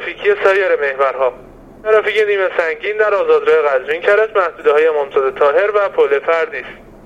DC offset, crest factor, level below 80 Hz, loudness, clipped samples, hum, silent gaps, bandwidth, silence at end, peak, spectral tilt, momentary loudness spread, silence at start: under 0.1%; 14 dB; -52 dBFS; -14 LUFS; under 0.1%; none; none; 8 kHz; 0.25 s; 0 dBFS; -4 dB/octave; 6 LU; 0 s